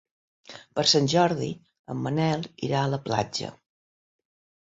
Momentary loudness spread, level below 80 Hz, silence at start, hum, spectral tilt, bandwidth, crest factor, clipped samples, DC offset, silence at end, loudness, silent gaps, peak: 18 LU; -62 dBFS; 0.5 s; none; -4.5 dB/octave; 8 kHz; 22 dB; under 0.1%; under 0.1%; 1.15 s; -25 LUFS; 1.79-1.84 s; -6 dBFS